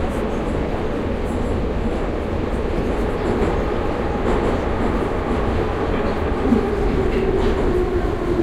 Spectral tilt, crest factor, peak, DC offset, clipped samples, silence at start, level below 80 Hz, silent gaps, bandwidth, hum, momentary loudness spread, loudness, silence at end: -7.5 dB/octave; 14 dB; -4 dBFS; under 0.1%; under 0.1%; 0 s; -26 dBFS; none; 12.5 kHz; none; 4 LU; -21 LUFS; 0 s